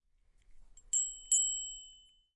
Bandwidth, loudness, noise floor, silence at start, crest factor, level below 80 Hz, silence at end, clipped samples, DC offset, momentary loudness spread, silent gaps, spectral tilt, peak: 11.5 kHz; -31 LUFS; -67 dBFS; 0.5 s; 22 dB; -64 dBFS; 0.4 s; under 0.1%; under 0.1%; 14 LU; none; 4.5 dB/octave; -16 dBFS